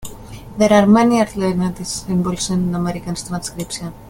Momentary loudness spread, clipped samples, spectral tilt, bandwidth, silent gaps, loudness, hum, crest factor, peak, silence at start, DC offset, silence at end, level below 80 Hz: 14 LU; under 0.1%; -5.5 dB/octave; 17 kHz; none; -17 LUFS; none; 18 dB; 0 dBFS; 0 s; under 0.1%; 0 s; -42 dBFS